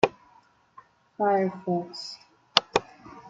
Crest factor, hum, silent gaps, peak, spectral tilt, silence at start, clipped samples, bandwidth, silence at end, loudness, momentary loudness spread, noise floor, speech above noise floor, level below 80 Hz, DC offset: 28 dB; none; none; 0 dBFS; -4.5 dB/octave; 0.05 s; under 0.1%; 9.2 kHz; 0 s; -27 LUFS; 16 LU; -60 dBFS; 33 dB; -62 dBFS; under 0.1%